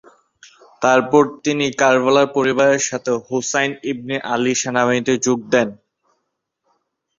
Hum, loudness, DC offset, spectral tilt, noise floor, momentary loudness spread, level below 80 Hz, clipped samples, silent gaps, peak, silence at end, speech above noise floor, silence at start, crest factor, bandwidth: none; -17 LUFS; under 0.1%; -3.5 dB/octave; -74 dBFS; 8 LU; -60 dBFS; under 0.1%; none; -2 dBFS; 1.45 s; 57 dB; 0.8 s; 18 dB; 7.8 kHz